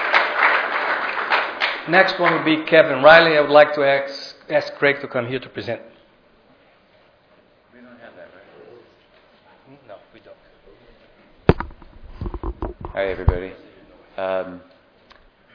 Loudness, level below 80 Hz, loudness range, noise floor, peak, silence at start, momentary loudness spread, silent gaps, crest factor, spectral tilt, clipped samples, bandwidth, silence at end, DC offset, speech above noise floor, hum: -18 LUFS; -36 dBFS; 15 LU; -55 dBFS; 0 dBFS; 0 s; 19 LU; none; 20 dB; -6.5 dB/octave; under 0.1%; 5.4 kHz; 0.95 s; under 0.1%; 38 dB; none